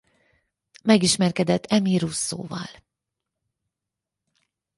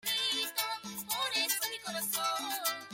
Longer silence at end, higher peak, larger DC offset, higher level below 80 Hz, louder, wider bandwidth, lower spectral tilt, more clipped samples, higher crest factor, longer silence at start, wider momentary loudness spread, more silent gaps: first, 2.05 s vs 0 s; first, -4 dBFS vs -18 dBFS; neither; first, -60 dBFS vs -78 dBFS; first, -22 LUFS vs -32 LUFS; second, 11.5 kHz vs 16.5 kHz; first, -4.5 dB/octave vs 0.5 dB/octave; neither; about the same, 22 dB vs 18 dB; first, 0.85 s vs 0.05 s; first, 15 LU vs 6 LU; neither